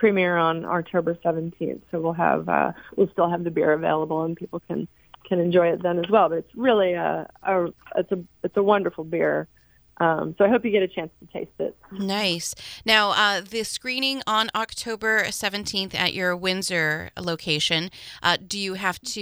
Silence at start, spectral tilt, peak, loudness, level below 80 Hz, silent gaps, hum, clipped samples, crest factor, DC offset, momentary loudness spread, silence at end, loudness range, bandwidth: 0 s; -4 dB/octave; -2 dBFS; -23 LUFS; -60 dBFS; none; none; under 0.1%; 22 dB; under 0.1%; 11 LU; 0 s; 2 LU; over 20 kHz